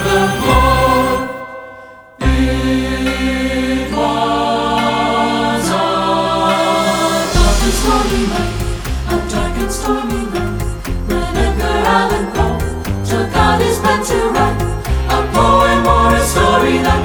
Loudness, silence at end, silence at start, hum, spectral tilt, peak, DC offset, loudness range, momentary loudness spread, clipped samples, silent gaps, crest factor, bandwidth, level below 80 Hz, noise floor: -14 LUFS; 0 s; 0 s; none; -5 dB/octave; 0 dBFS; under 0.1%; 4 LU; 8 LU; under 0.1%; none; 14 dB; over 20 kHz; -22 dBFS; -36 dBFS